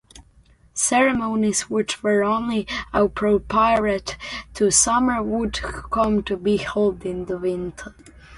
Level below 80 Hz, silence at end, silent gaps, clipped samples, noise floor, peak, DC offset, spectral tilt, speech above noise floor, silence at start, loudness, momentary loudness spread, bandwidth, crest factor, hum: -42 dBFS; 0 s; none; under 0.1%; -54 dBFS; -4 dBFS; under 0.1%; -3.5 dB/octave; 33 dB; 0.15 s; -21 LUFS; 12 LU; 11.5 kHz; 18 dB; none